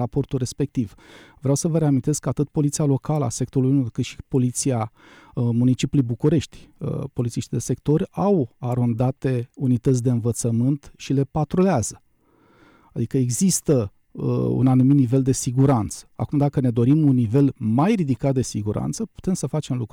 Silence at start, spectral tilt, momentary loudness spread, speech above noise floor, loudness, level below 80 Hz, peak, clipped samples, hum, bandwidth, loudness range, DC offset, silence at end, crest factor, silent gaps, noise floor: 0 s; -7 dB/octave; 10 LU; 38 dB; -22 LUFS; -48 dBFS; -8 dBFS; under 0.1%; none; 16 kHz; 4 LU; under 0.1%; 0.05 s; 14 dB; none; -59 dBFS